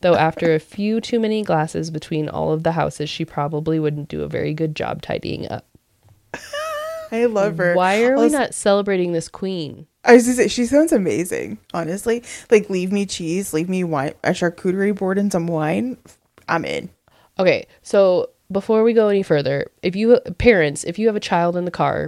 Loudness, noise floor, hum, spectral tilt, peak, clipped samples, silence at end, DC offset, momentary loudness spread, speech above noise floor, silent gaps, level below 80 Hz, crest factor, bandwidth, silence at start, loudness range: -19 LUFS; -55 dBFS; none; -5.5 dB/octave; 0 dBFS; under 0.1%; 0 s; under 0.1%; 11 LU; 37 dB; none; -48 dBFS; 18 dB; 15 kHz; 0.05 s; 7 LU